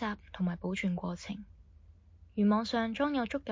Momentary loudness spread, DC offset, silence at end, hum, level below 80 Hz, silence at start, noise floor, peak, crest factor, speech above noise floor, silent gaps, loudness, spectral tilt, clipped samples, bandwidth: 13 LU; under 0.1%; 0 s; none; -56 dBFS; 0 s; -58 dBFS; -18 dBFS; 16 dB; 25 dB; none; -33 LUFS; -6.5 dB/octave; under 0.1%; 7.6 kHz